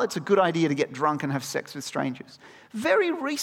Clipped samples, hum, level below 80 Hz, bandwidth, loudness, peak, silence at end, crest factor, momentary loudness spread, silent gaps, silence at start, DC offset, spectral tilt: under 0.1%; none; -74 dBFS; 16.5 kHz; -25 LUFS; -8 dBFS; 0 s; 18 dB; 11 LU; none; 0 s; under 0.1%; -5 dB/octave